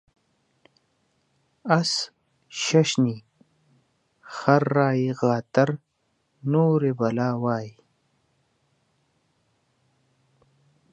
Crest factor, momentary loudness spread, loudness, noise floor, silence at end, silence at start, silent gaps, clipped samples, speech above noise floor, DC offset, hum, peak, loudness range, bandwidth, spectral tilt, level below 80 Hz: 24 dB; 16 LU; -23 LUFS; -72 dBFS; 3.25 s; 1.65 s; none; under 0.1%; 50 dB; under 0.1%; none; -2 dBFS; 6 LU; 10.5 kHz; -5.5 dB/octave; -72 dBFS